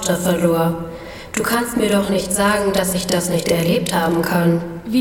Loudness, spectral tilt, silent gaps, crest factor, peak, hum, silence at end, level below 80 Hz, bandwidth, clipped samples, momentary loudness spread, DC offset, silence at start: -18 LUFS; -4.5 dB/octave; none; 16 dB; -2 dBFS; none; 0 s; -42 dBFS; 18 kHz; under 0.1%; 6 LU; under 0.1%; 0 s